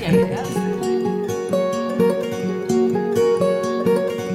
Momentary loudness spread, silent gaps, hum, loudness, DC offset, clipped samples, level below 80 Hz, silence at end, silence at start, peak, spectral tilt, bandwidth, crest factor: 5 LU; none; none; -20 LUFS; under 0.1%; under 0.1%; -54 dBFS; 0 s; 0 s; -4 dBFS; -6.5 dB/octave; 16 kHz; 14 dB